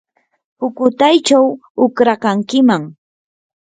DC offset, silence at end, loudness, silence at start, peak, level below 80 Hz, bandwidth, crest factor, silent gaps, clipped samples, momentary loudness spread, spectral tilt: under 0.1%; 0.7 s; -14 LUFS; 0.6 s; 0 dBFS; -62 dBFS; 9.4 kHz; 14 dB; 1.70-1.75 s; under 0.1%; 11 LU; -4.5 dB/octave